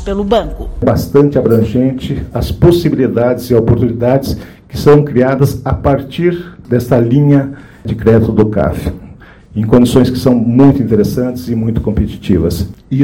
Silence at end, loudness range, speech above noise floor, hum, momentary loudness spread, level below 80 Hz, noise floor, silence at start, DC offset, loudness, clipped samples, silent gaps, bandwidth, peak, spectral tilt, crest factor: 0 s; 1 LU; 24 dB; none; 12 LU; -28 dBFS; -35 dBFS; 0 s; under 0.1%; -12 LUFS; 2%; none; 17 kHz; 0 dBFS; -8 dB/octave; 12 dB